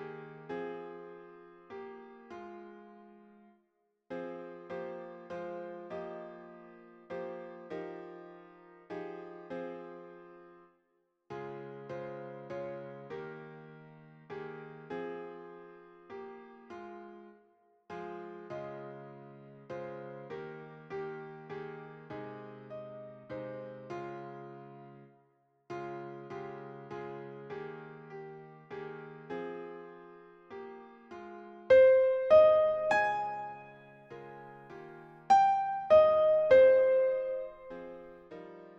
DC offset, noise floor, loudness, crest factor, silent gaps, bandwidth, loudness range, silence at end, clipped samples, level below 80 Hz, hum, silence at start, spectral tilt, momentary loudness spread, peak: under 0.1%; -77 dBFS; -31 LUFS; 22 dB; none; 7.4 kHz; 20 LU; 0 s; under 0.1%; -72 dBFS; none; 0 s; -6 dB/octave; 26 LU; -12 dBFS